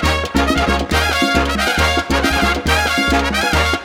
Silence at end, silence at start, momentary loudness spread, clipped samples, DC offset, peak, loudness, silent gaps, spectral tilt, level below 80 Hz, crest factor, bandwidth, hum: 0 s; 0 s; 2 LU; under 0.1%; under 0.1%; 0 dBFS; -15 LUFS; none; -4 dB/octave; -24 dBFS; 16 dB; 17 kHz; none